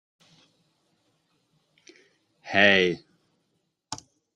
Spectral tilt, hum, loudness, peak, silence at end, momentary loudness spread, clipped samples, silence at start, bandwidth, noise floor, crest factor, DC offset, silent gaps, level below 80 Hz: -4 dB/octave; none; -20 LUFS; -4 dBFS; 0.4 s; 22 LU; under 0.1%; 2.45 s; 10.5 kHz; -75 dBFS; 26 dB; under 0.1%; none; -70 dBFS